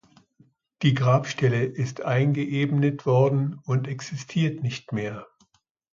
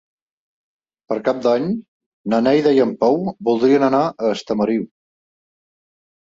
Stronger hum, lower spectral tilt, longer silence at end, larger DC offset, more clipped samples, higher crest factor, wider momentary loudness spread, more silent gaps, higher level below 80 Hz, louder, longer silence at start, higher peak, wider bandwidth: neither; about the same, -7 dB/octave vs -7 dB/octave; second, 0.7 s vs 1.35 s; neither; neither; about the same, 18 dB vs 16 dB; about the same, 10 LU vs 10 LU; second, none vs 1.88-2.00 s, 2.06-2.24 s; about the same, -62 dBFS vs -62 dBFS; second, -25 LUFS vs -18 LUFS; second, 0.8 s vs 1.1 s; second, -8 dBFS vs -4 dBFS; about the same, 7.4 kHz vs 7.8 kHz